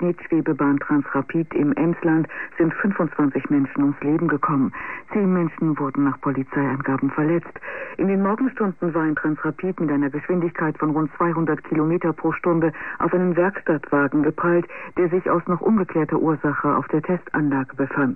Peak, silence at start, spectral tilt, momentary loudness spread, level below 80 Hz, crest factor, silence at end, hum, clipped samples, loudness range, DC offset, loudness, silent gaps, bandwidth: -8 dBFS; 0 s; -11.5 dB/octave; 4 LU; -58 dBFS; 12 dB; 0 s; none; under 0.1%; 2 LU; 0.5%; -22 LUFS; none; 3.1 kHz